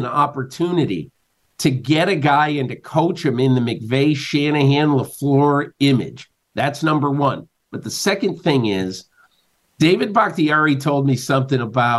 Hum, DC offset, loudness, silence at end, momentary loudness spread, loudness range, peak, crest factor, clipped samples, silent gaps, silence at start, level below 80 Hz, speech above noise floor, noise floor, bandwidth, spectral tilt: none; under 0.1%; -18 LUFS; 0 s; 8 LU; 3 LU; -4 dBFS; 14 dB; under 0.1%; none; 0 s; -60 dBFS; 46 dB; -63 dBFS; 12.5 kHz; -6 dB/octave